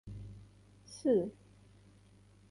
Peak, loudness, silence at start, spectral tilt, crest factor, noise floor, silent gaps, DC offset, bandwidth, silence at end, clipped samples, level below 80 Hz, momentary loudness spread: -20 dBFS; -34 LUFS; 0.05 s; -7 dB/octave; 20 dB; -62 dBFS; none; under 0.1%; 11.5 kHz; 1.2 s; under 0.1%; -62 dBFS; 21 LU